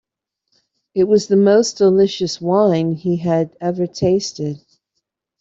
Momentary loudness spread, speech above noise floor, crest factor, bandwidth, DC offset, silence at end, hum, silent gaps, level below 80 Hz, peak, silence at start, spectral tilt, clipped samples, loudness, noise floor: 11 LU; 59 dB; 14 dB; 8 kHz; under 0.1%; 0.85 s; none; none; -56 dBFS; -2 dBFS; 0.95 s; -6 dB/octave; under 0.1%; -17 LUFS; -75 dBFS